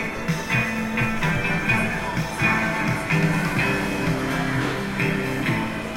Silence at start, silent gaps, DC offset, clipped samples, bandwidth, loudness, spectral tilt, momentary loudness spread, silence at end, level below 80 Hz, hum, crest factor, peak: 0 s; none; under 0.1%; under 0.1%; 16 kHz; -23 LUFS; -5.5 dB/octave; 4 LU; 0 s; -40 dBFS; none; 16 dB; -8 dBFS